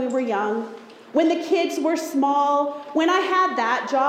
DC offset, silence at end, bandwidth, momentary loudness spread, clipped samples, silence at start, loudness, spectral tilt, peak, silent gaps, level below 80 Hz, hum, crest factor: under 0.1%; 0 s; 16 kHz; 7 LU; under 0.1%; 0 s; -22 LUFS; -3.5 dB/octave; -8 dBFS; none; -74 dBFS; none; 14 dB